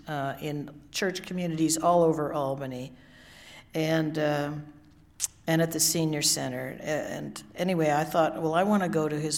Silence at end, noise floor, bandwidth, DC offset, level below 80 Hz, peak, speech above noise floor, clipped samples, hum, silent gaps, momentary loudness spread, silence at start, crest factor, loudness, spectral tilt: 0 s; -50 dBFS; 18.5 kHz; under 0.1%; -62 dBFS; -6 dBFS; 23 dB; under 0.1%; none; none; 13 LU; 0.05 s; 22 dB; -27 LUFS; -4 dB/octave